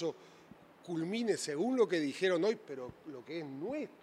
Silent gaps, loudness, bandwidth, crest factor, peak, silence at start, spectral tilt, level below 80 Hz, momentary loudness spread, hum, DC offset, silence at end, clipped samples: none; -35 LUFS; 13 kHz; 18 dB; -18 dBFS; 0 s; -4.5 dB/octave; -78 dBFS; 15 LU; none; under 0.1%; 0.05 s; under 0.1%